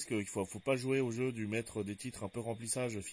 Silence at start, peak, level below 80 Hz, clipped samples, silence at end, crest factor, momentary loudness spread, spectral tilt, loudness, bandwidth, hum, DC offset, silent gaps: 0 s; -20 dBFS; -68 dBFS; under 0.1%; 0 s; 18 dB; 8 LU; -5 dB/octave; -37 LUFS; 10.5 kHz; none; under 0.1%; none